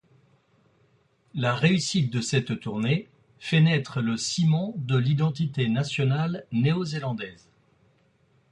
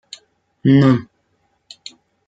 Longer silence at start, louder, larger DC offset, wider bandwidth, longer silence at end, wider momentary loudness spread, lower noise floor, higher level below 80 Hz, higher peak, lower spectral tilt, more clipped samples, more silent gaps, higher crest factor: first, 1.35 s vs 0.65 s; second, -25 LUFS vs -15 LUFS; neither; first, 10.5 kHz vs 7.8 kHz; about the same, 1.2 s vs 1.25 s; second, 9 LU vs 26 LU; about the same, -64 dBFS vs -65 dBFS; about the same, -62 dBFS vs -58 dBFS; second, -8 dBFS vs -2 dBFS; second, -5.5 dB/octave vs -8 dB/octave; neither; neither; about the same, 20 dB vs 16 dB